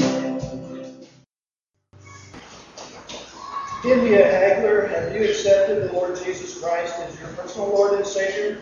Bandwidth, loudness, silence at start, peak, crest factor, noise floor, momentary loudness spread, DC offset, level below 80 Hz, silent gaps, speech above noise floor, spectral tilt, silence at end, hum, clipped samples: 7.6 kHz; -20 LUFS; 0 s; -2 dBFS; 20 dB; -89 dBFS; 23 LU; under 0.1%; -54 dBFS; none; 70 dB; -4.5 dB/octave; 0 s; none; under 0.1%